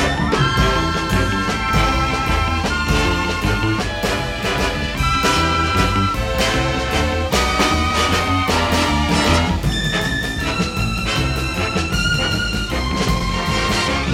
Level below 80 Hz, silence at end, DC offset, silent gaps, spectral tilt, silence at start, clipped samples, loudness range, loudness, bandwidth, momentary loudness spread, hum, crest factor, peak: -26 dBFS; 0 s; under 0.1%; none; -4.5 dB/octave; 0 s; under 0.1%; 2 LU; -18 LUFS; 17 kHz; 4 LU; none; 16 dB; -2 dBFS